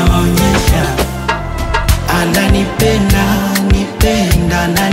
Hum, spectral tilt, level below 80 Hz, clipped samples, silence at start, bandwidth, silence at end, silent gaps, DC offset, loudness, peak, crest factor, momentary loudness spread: none; -5 dB/octave; -18 dBFS; under 0.1%; 0 s; 16.5 kHz; 0 s; none; under 0.1%; -12 LUFS; 0 dBFS; 12 dB; 5 LU